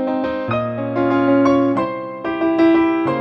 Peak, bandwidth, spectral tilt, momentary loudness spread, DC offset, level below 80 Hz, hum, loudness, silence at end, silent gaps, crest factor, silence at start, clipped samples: -4 dBFS; 6 kHz; -8 dB/octave; 8 LU; under 0.1%; -52 dBFS; none; -17 LUFS; 0 s; none; 14 dB; 0 s; under 0.1%